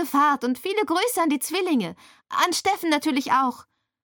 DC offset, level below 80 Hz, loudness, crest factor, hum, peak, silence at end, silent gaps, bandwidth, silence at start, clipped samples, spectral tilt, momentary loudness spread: under 0.1%; -70 dBFS; -23 LUFS; 18 dB; none; -4 dBFS; 0.4 s; none; 17.5 kHz; 0 s; under 0.1%; -2.5 dB/octave; 5 LU